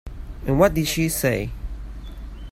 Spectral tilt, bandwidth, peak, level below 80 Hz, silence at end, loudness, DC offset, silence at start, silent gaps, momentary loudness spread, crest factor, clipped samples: -5 dB/octave; 16.5 kHz; -2 dBFS; -34 dBFS; 0 s; -22 LUFS; under 0.1%; 0.05 s; none; 20 LU; 20 dB; under 0.1%